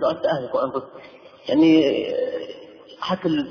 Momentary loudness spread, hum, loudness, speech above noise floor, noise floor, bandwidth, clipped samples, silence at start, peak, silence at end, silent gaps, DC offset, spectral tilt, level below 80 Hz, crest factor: 21 LU; none; -21 LUFS; 21 dB; -42 dBFS; 5.4 kHz; under 0.1%; 0 s; -6 dBFS; 0 s; none; under 0.1%; -7 dB/octave; -62 dBFS; 16 dB